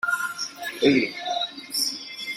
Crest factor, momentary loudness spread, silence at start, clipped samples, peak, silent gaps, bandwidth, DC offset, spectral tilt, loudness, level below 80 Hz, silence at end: 20 dB; 10 LU; 0.05 s; under 0.1%; -6 dBFS; none; 16 kHz; under 0.1%; -2.5 dB/octave; -25 LUFS; -66 dBFS; 0 s